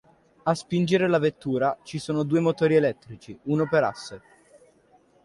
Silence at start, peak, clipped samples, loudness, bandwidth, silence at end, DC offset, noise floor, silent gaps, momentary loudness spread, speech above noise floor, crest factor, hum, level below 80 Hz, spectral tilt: 0.45 s; -8 dBFS; under 0.1%; -24 LUFS; 11.5 kHz; 1.05 s; under 0.1%; -60 dBFS; none; 17 LU; 36 dB; 18 dB; none; -62 dBFS; -6.5 dB/octave